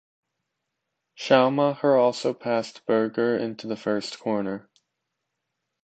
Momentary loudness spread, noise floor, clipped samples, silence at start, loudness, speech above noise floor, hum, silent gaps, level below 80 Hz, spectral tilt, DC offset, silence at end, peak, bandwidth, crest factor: 11 LU; -81 dBFS; under 0.1%; 1.2 s; -24 LUFS; 58 dB; none; none; -72 dBFS; -5.5 dB/octave; under 0.1%; 1.25 s; -2 dBFS; 9 kHz; 22 dB